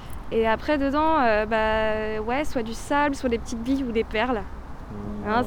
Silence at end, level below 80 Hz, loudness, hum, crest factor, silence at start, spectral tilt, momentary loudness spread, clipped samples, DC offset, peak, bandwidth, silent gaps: 0 s; -38 dBFS; -24 LUFS; none; 16 dB; 0 s; -5.5 dB/octave; 11 LU; under 0.1%; under 0.1%; -8 dBFS; 18.5 kHz; none